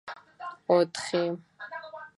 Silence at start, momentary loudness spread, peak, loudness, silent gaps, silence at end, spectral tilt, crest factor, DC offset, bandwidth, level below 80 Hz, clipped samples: 0.05 s; 17 LU; -10 dBFS; -28 LUFS; none; 0.1 s; -5 dB/octave; 22 dB; under 0.1%; 11.5 kHz; -78 dBFS; under 0.1%